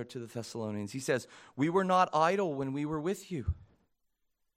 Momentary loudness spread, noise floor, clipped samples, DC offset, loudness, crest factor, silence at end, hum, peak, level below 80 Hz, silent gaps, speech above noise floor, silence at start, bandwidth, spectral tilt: 14 LU; -79 dBFS; under 0.1%; under 0.1%; -32 LUFS; 20 dB; 0.95 s; none; -12 dBFS; -52 dBFS; none; 47 dB; 0 s; 16 kHz; -6 dB/octave